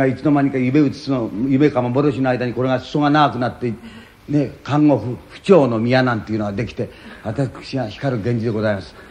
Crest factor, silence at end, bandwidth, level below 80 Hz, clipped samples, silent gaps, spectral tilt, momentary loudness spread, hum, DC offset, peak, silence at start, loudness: 18 dB; 0.05 s; 9.6 kHz; -48 dBFS; under 0.1%; none; -8 dB/octave; 12 LU; none; under 0.1%; 0 dBFS; 0 s; -19 LUFS